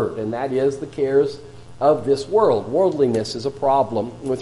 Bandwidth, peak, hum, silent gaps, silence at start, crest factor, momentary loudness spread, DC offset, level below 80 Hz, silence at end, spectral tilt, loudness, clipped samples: 11.5 kHz; -4 dBFS; none; none; 0 s; 16 dB; 8 LU; under 0.1%; -54 dBFS; 0 s; -6.5 dB/octave; -20 LUFS; under 0.1%